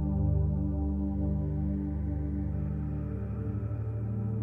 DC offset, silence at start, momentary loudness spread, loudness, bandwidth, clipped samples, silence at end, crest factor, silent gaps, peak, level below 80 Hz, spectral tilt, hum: under 0.1%; 0 s; 6 LU; -32 LUFS; 2.6 kHz; under 0.1%; 0 s; 14 dB; none; -18 dBFS; -36 dBFS; -12.5 dB/octave; 50 Hz at -50 dBFS